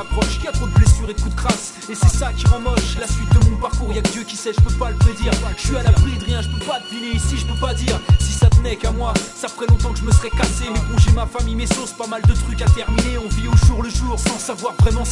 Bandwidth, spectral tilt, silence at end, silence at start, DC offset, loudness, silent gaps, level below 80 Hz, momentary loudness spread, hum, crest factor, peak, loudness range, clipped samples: 11.5 kHz; -5.5 dB/octave; 0 s; 0 s; under 0.1%; -18 LUFS; none; -20 dBFS; 8 LU; none; 16 dB; 0 dBFS; 1 LU; under 0.1%